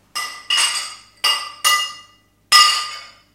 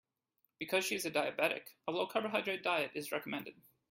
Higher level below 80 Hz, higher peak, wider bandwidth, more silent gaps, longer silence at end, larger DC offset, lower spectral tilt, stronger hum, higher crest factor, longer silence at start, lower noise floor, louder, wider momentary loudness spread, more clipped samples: first, -66 dBFS vs -84 dBFS; first, 0 dBFS vs -18 dBFS; about the same, 16.5 kHz vs 16.5 kHz; neither; second, 0.25 s vs 0.4 s; neither; second, 4 dB/octave vs -3 dB/octave; first, 50 Hz at -60 dBFS vs none; about the same, 20 dB vs 20 dB; second, 0.15 s vs 0.6 s; second, -52 dBFS vs -82 dBFS; first, -16 LUFS vs -36 LUFS; first, 17 LU vs 9 LU; neither